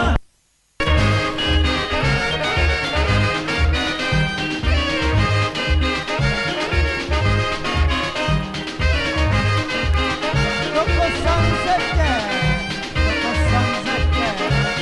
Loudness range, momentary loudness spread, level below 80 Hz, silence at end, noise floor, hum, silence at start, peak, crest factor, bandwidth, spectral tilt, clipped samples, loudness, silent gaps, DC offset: 1 LU; 3 LU; -24 dBFS; 0 s; -61 dBFS; none; 0 s; -2 dBFS; 18 dB; 11.5 kHz; -5 dB/octave; under 0.1%; -19 LUFS; none; under 0.1%